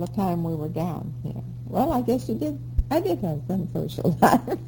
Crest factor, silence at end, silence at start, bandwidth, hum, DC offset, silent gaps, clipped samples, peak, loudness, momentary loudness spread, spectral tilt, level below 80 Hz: 22 dB; 0 s; 0 s; over 20 kHz; none; under 0.1%; none; under 0.1%; -4 dBFS; -25 LUFS; 12 LU; -7.5 dB/octave; -36 dBFS